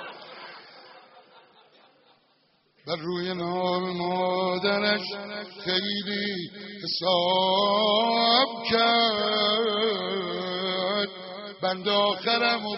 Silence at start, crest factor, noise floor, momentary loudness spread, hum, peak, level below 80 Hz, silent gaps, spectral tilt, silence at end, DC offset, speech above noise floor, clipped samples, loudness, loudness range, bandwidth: 0 s; 22 dB; -66 dBFS; 15 LU; none; -6 dBFS; -70 dBFS; none; -1.5 dB/octave; 0 s; under 0.1%; 41 dB; under 0.1%; -25 LUFS; 11 LU; 6 kHz